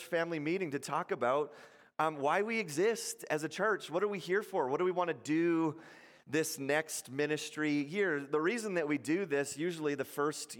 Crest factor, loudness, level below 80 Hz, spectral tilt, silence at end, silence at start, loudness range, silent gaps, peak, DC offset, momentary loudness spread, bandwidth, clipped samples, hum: 18 dB; -34 LUFS; -86 dBFS; -4.5 dB/octave; 0 s; 0 s; 1 LU; none; -18 dBFS; under 0.1%; 5 LU; 17 kHz; under 0.1%; none